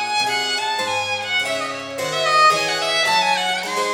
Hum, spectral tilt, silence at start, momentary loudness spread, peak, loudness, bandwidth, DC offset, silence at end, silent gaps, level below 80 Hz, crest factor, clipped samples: none; -1 dB/octave; 0 s; 9 LU; -6 dBFS; -18 LUFS; 19.5 kHz; under 0.1%; 0 s; none; -64 dBFS; 14 dB; under 0.1%